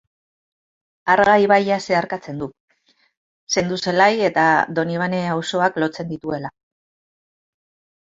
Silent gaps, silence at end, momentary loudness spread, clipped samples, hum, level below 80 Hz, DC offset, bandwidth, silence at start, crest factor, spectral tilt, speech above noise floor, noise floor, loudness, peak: 2.60-2.68 s, 3.17-3.47 s; 1.5 s; 14 LU; under 0.1%; none; -60 dBFS; under 0.1%; 8 kHz; 1.05 s; 20 dB; -4.5 dB/octave; over 72 dB; under -90 dBFS; -19 LUFS; -2 dBFS